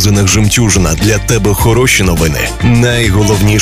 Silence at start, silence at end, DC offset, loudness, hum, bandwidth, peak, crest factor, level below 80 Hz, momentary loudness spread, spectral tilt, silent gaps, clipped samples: 0 s; 0 s; 1%; -9 LUFS; none; 16 kHz; 0 dBFS; 8 dB; -20 dBFS; 3 LU; -4.5 dB/octave; none; under 0.1%